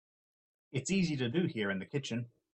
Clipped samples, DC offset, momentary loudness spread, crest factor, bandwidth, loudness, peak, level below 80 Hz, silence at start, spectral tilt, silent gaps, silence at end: under 0.1%; under 0.1%; 8 LU; 18 dB; 8.8 kHz; -35 LUFS; -18 dBFS; -68 dBFS; 0.75 s; -5.5 dB/octave; none; 0.25 s